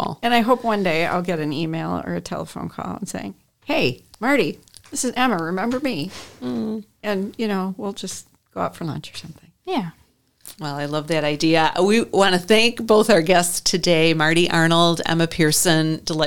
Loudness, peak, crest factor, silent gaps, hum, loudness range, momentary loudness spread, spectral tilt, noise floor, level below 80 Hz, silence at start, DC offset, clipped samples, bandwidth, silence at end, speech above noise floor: -20 LUFS; -2 dBFS; 18 dB; none; none; 11 LU; 15 LU; -4 dB/octave; -48 dBFS; -50 dBFS; 0 s; 0.9%; under 0.1%; 19 kHz; 0 s; 28 dB